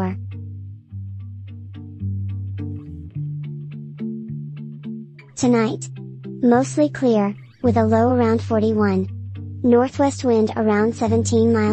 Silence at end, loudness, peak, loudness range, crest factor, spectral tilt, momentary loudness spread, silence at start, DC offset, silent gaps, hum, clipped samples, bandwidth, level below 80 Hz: 0 s; -20 LUFS; -4 dBFS; 12 LU; 18 dB; -7 dB/octave; 18 LU; 0 s; under 0.1%; none; none; under 0.1%; 8.8 kHz; -56 dBFS